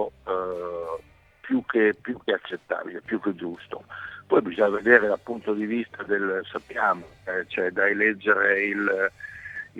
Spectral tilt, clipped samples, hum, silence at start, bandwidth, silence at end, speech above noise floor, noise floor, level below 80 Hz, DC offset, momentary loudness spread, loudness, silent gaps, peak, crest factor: -6.5 dB/octave; under 0.1%; none; 0 s; 8 kHz; 0 s; 25 dB; -49 dBFS; -62 dBFS; under 0.1%; 16 LU; -25 LUFS; none; -2 dBFS; 24 dB